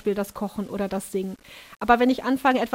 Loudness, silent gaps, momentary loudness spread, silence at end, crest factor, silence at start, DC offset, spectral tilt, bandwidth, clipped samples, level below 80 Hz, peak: -24 LUFS; none; 14 LU; 0 s; 20 dB; 0.05 s; under 0.1%; -5.5 dB/octave; 16 kHz; under 0.1%; -52 dBFS; -4 dBFS